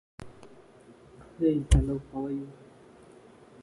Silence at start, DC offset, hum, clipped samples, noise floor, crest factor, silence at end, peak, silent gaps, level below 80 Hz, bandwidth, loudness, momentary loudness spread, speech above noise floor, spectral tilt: 0.2 s; under 0.1%; none; under 0.1%; -54 dBFS; 22 dB; 1.1 s; -8 dBFS; none; -34 dBFS; 11.5 kHz; -29 LUFS; 25 LU; 28 dB; -7 dB/octave